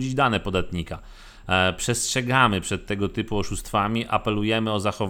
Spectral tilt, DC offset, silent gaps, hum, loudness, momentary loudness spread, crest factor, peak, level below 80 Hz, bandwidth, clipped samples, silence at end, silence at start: -4 dB/octave; under 0.1%; none; none; -23 LUFS; 10 LU; 20 dB; -4 dBFS; -42 dBFS; 18.5 kHz; under 0.1%; 0 s; 0 s